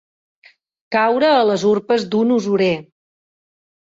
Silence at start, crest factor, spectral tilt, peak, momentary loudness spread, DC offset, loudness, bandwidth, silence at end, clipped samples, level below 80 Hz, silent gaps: 0.9 s; 14 dB; -5.5 dB/octave; -4 dBFS; 6 LU; under 0.1%; -17 LUFS; 7.8 kHz; 1.05 s; under 0.1%; -62 dBFS; none